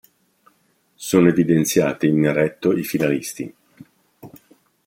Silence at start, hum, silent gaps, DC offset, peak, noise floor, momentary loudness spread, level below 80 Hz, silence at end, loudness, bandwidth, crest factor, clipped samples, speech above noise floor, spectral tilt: 1 s; none; none; under 0.1%; -2 dBFS; -63 dBFS; 15 LU; -58 dBFS; 0.6 s; -19 LUFS; 16.5 kHz; 20 dB; under 0.1%; 45 dB; -6 dB/octave